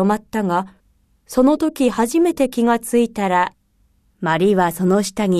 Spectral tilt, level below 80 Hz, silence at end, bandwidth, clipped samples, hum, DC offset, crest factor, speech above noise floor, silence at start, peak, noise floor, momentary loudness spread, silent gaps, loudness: -6 dB/octave; -50 dBFS; 0 s; 14 kHz; under 0.1%; none; under 0.1%; 14 dB; 43 dB; 0 s; -4 dBFS; -60 dBFS; 6 LU; none; -18 LUFS